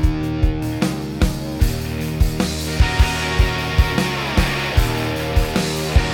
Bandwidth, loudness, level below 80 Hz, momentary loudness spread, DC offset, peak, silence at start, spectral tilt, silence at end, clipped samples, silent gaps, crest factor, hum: 17.5 kHz; -20 LUFS; -22 dBFS; 4 LU; under 0.1%; -2 dBFS; 0 s; -5 dB/octave; 0 s; under 0.1%; none; 16 dB; none